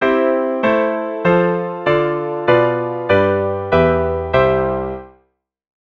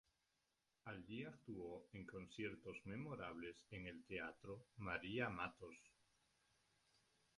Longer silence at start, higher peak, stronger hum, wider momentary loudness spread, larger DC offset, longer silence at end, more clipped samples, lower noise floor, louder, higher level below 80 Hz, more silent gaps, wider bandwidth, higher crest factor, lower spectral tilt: second, 0 s vs 0.85 s; first, 0 dBFS vs -30 dBFS; neither; second, 5 LU vs 12 LU; neither; second, 0.85 s vs 1.45 s; neither; second, -63 dBFS vs -88 dBFS; first, -16 LUFS vs -52 LUFS; first, -38 dBFS vs -74 dBFS; neither; second, 6.2 kHz vs 11 kHz; second, 16 dB vs 24 dB; first, -8.5 dB/octave vs -6 dB/octave